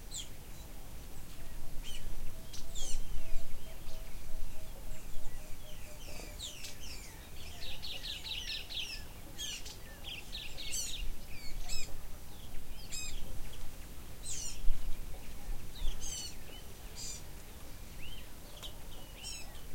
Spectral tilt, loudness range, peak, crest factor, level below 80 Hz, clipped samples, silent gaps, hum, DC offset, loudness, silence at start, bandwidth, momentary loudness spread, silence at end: -2 dB/octave; 6 LU; -12 dBFS; 20 dB; -42 dBFS; under 0.1%; none; none; under 0.1%; -45 LUFS; 0 s; 16.5 kHz; 11 LU; 0 s